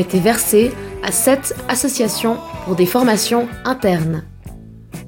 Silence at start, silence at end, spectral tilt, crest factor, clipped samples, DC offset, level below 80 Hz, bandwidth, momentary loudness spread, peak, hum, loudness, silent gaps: 0 s; 0 s; -4 dB/octave; 16 dB; under 0.1%; under 0.1%; -42 dBFS; 17 kHz; 12 LU; 0 dBFS; none; -17 LUFS; none